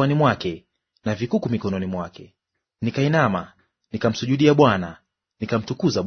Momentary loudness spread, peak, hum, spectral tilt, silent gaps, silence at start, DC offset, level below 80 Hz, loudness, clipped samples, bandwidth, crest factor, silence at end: 17 LU; -2 dBFS; none; -6.5 dB/octave; none; 0 s; under 0.1%; -56 dBFS; -22 LUFS; under 0.1%; 6.6 kHz; 20 dB; 0 s